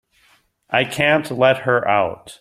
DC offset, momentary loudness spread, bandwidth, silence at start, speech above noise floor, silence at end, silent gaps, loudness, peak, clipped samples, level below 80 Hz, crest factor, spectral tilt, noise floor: under 0.1%; 5 LU; 15 kHz; 0.7 s; 40 dB; 0.05 s; none; -18 LUFS; 0 dBFS; under 0.1%; -58 dBFS; 18 dB; -5 dB/octave; -58 dBFS